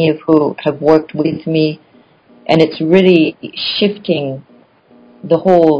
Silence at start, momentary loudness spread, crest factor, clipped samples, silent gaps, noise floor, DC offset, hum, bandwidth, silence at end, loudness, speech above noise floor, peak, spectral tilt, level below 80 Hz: 0 s; 12 LU; 14 dB; 0.5%; none; -47 dBFS; under 0.1%; none; 8 kHz; 0 s; -13 LUFS; 35 dB; 0 dBFS; -8 dB/octave; -54 dBFS